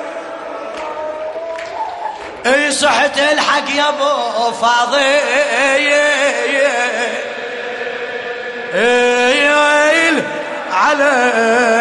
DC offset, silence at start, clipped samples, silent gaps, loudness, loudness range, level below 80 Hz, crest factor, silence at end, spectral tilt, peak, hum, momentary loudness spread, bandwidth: under 0.1%; 0 s; under 0.1%; none; -14 LUFS; 3 LU; -58 dBFS; 12 dB; 0 s; -1.5 dB/octave; -2 dBFS; none; 13 LU; 11.5 kHz